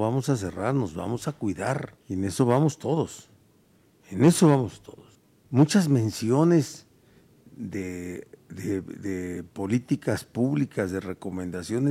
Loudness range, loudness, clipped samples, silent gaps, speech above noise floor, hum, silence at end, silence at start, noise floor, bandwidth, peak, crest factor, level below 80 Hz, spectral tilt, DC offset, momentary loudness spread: 8 LU; -26 LUFS; under 0.1%; none; 36 dB; none; 0 s; 0 s; -61 dBFS; 15.5 kHz; -6 dBFS; 20 dB; -60 dBFS; -6.5 dB/octave; under 0.1%; 15 LU